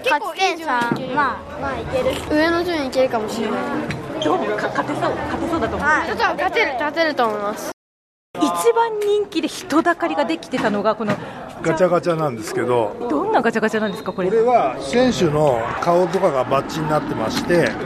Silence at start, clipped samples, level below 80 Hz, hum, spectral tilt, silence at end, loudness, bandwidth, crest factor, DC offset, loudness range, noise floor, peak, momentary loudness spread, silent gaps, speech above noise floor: 0 s; under 0.1%; -46 dBFS; none; -5 dB/octave; 0 s; -20 LUFS; 13.5 kHz; 16 dB; under 0.1%; 3 LU; under -90 dBFS; -4 dBFS; 7 LU; 7.73-8.34 s; over 71 dB